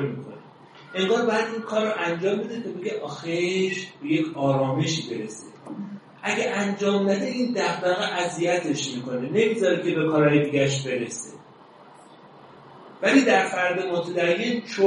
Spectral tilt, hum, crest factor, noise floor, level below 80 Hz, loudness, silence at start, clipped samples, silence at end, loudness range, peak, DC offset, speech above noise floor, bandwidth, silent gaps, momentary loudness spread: -5 dB/octave; none; 20 dB; -49 dBFS; -70 dBFS; -24 LUFS; 0 s; under 0.1%; 0 s; 3 LU; -4 dBFS; under 0.1%; 25 dB; 11 kHz; none; 12 LU